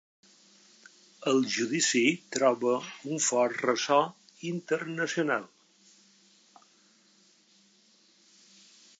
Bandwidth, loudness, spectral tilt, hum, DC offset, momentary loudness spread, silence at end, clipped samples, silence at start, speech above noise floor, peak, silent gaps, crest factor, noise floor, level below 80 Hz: 9.4 kHz; -28 LUFS; -3 dB/octave; none; under 0.1%; 10 LU; 3.55 s; under 0.1%; 1.2 s; 35 dB; -10 dBFS; none; 22 dB; -63 dBFS; -86 dBFS